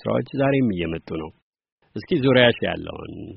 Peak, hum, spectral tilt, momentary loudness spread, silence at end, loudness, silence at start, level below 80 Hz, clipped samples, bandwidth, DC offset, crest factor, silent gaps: -2 dBFS; none; -4.5 dB/octave; 20 LU; 0 s; -21 LUFS; 0.05 s; -50 dBFS; under 0.1%; 5.6 kHz; under 0.1%; 20 dB; 1.42-1.53 s, 1.72-1.78 s